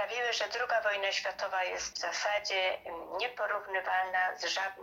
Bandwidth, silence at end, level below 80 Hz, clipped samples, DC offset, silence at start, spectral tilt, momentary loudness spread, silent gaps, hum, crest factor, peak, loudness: 16.5 kHz; 0 s; -70 dBFS; under 0.1%; under 0.1%; 0 s; 0.5 dB/octave; 5 LU; none; none; 16 dB; -18 dBFS; -32 LUFS